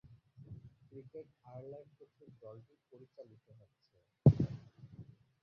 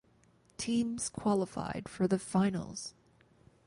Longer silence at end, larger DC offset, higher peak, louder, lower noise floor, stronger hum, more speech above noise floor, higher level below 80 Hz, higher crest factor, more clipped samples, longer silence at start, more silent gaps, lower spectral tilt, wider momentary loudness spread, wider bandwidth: second, 0.4 s vs 0.75 s; neither; first, -12 dBFS vs -16 dBFS; first, -31 LUFS vs -34 LUFS; second, -58 dBFS vs -66 dBFS; neither; second, 2 dB vs 34 dB; first, -56 dBFS vs -62 dBFS; first, 26 dB vs 18 dB; neither; about the same, 0.5 s vs 0.6 s; neither; first, -12 dB/octave vs -5.5 dB/octave; first, 28 LU vs 12 LU; second, 5.6 kHz vs 11.5 kHz